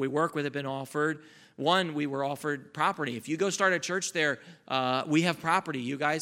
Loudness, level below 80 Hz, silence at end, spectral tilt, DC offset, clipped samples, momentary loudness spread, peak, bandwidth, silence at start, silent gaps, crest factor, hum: -29 LUFS; -78 dBFS; 0 s; -4 dB/octave; under 0.1%; under 0.1%; 8 LU; -8 dBFS; 16.5 kHz; 0 s; none; 20 dB; none